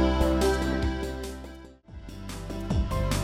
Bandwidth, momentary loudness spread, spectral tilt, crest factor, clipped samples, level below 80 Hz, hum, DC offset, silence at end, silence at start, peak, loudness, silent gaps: 15.5 kHz; 21 LU; -6 dB/octave; 16 dB; under 0.1%; -32 dBFS; none; under 0.1%; 0 s; 0 s; -10 dBFS; -28 LUFS; none